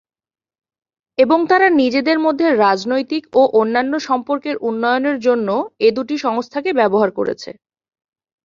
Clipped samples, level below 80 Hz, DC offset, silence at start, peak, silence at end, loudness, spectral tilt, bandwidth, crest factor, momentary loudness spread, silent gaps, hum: under 0.1%; -62 dBFS; under 0.1%; 1.2 s; -2 dBFS; 0.95 s; -16 LUFS; -5.5 dB/octave; 7.4 kHz; 16 dB; 8 LU; none; none